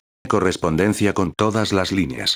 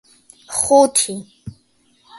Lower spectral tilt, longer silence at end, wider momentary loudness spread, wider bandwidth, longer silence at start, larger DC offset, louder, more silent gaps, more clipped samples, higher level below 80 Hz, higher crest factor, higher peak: first, -5 dB/octave vs -3 dB/octave; about the same, 0 s vs 0 s; second, 2 LU vs 19 LU; first, over 20 kHz vs 12 kHz; second, 0.25 s vs 0.5 s; neither; second, -20 LUFS vs -15 LUFS; neither; neither; first, -46 dBFS vs -54 dBFS; about the same, 16 dB vs 20 dB; second, -4 dBFS vs 0 dBFS